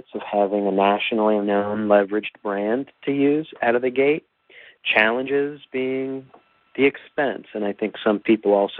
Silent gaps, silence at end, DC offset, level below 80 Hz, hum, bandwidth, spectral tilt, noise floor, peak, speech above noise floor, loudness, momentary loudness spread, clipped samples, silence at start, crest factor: none; 0 s; under 0.1%; -68 dBFS; none; 4.4 kHz; -3.5 dB/octave; -49 dBFS; -2 dBFS; 28 dB; -21 LUFS; 9 LU; under 0.1%; 0.15 s; 20 dB